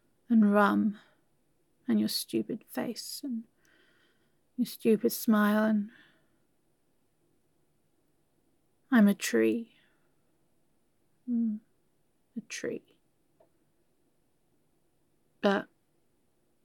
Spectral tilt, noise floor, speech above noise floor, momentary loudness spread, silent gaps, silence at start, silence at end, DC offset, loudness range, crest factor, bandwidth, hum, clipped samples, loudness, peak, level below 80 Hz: -5.5 dB/octave; -75 dBFS; 47 dB; 19 LU; none; 0.3 s; 1 s; under 0.1%; 9 LU; 22 dB; 17.5 kHz; none; under 0.1%; -29 LUFS; -10 dBFS; -84 dBFS